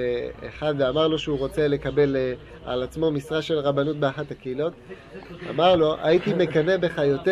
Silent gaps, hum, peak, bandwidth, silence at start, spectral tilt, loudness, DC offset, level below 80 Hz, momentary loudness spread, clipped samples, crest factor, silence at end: none; none; -6 dBFS; 12.5 kHz; 0 s; -7 dB/octave; -23 LUFS; under 0.1%; -48 dBFS; 13 LU; under 0.1%; 18 dB; 0 s